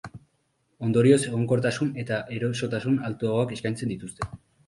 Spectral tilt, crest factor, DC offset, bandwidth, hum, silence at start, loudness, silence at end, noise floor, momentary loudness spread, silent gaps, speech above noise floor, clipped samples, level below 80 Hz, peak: -6.5 dB/octave; 20 dB; under 0.1%; 11.5 kHz; none; 0.05 s; -26 LUFS; 0.3 s; -71 dBFS; 14 LU; none; 46 dB; under 0.1%; -56 dBFS; -6 dBFS